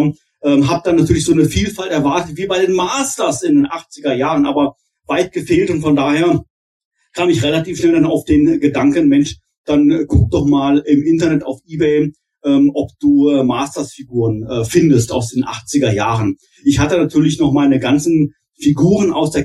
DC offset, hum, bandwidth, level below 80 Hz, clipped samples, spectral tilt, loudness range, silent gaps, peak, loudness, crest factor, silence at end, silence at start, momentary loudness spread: under 0.1%; none; 12.5 kHz; -38 dBFS; under 0.1%; -6 dB/octave; 3 LU; 6.50-6.91 s, 9.58-9.64 s; 0 dBFS; -15 LUFS; 14 dB; 0 s; 0 s; 7 LU